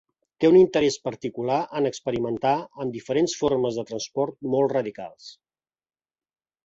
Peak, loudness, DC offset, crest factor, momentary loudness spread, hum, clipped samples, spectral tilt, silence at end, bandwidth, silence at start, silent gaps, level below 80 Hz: -6 dBFS; -24 LUFS; under 0.1%; 18 dB; 14 LU; none; under 0.1%; -5.5 dB/octave; 1.35 s; 8 kHz; 0.4 s; none; -60 dBFS